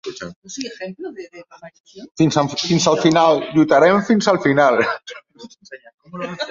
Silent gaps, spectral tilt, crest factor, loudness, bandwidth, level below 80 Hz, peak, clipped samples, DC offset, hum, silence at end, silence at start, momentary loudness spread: 0.36-0.42 s, 1.80-1.84 s, 5.94-5.98 s; -5 dB/octave; 18 dB; -16 LUFS; 7.6 kHz; -58 dBFS; -2 dBFS; under 0.1%; under 0.1%; none; 0 s; 0.05 s; 23 LU